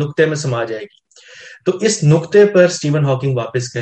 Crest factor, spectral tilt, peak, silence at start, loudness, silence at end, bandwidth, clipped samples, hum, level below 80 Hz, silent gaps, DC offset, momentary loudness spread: 14 dB; -5.5 dB/octave; 0 dBFS; 0 s; -15 LUFS; 0 s; 9 kHz; under 0.1%; none; -58 dBFS; none; under 0.1%; 10 LU